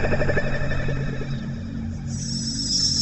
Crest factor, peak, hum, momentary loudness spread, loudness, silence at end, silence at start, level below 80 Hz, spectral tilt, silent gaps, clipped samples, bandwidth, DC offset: 14 dB; -8 dBFS; none; 10 LU; -25 LUFS; 0 s; 0 s; -32 dBFS; -4 dB/octave; none; under 0.1%; 8.6 kHz; under 0.1%